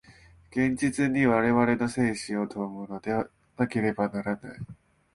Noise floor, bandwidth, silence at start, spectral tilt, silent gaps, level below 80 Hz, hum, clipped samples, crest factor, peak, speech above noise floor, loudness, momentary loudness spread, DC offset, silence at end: -55 dBFS; 11.5 kHz; 0.1 s; -6.5 dB/octave; none; -58 dBFS; none; under 0.1%; 18 dB; -8 dBFS; 28 dB; -27 LUFS; 13 LU; under 0.1%; 0.4 s